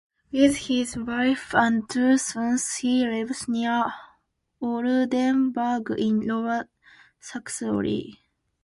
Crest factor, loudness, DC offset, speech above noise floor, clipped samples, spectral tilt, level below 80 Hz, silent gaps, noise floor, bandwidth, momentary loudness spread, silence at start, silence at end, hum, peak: 18 dB; -24 LUFS; under 0.1%; 43 dB; under 0.1%; -4 dB/octave; -58 dBFS; none; -66 dBFS; 11.5 kHz; 11 LU; 0.35 s; 0.5 s; none; -6 dBFS